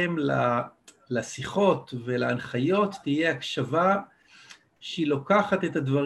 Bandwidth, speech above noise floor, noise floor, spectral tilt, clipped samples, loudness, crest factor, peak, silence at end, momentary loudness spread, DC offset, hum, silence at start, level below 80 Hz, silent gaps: 12 kHz; 27 dB; -52 dBFS; -6 dB/octave; under 0.1%; -26 LUFS; 20 dB; -8 dBFS; 0 s; 8 LU; under 0.1%; none; 0 s; -64 dBFS; none